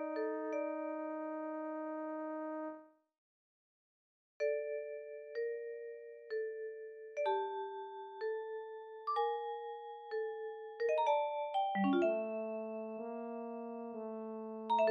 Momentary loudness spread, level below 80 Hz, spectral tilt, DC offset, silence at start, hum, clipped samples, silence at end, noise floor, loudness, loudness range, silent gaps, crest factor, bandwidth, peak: 13 LU; -90 dBFS; -4 dB/octave; under 0.1%; 0 s; none; under 0.1%; 0 s; under -90 dBFS; -40 LUFS; 7 LU; 3.18-4.40 s; 18 dB; 7 kHz; -22 dBFS